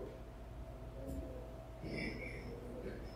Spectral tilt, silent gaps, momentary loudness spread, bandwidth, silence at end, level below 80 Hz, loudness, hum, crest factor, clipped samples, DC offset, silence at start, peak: -6.5 dB/octave; none; 9 LU; 16 kHz; 0 s; -52 dBFS; -48 LUFS; none; 18 dB; under 0.1%; under 0.1%; 0 s; -30 dBFS